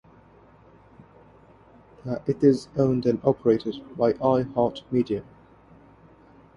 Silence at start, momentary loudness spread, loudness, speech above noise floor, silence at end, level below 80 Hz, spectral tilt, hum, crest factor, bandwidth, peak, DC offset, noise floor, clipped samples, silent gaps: 2.05 s; 11 LU; -24 LUFS; 30 dB; 1.35 s; -58 dBFS; -8.5 dB/octave; none; 20 dB; 11 kHz; -6 dBFS; under 0.1%; -53 dBFS; under 0.1%; none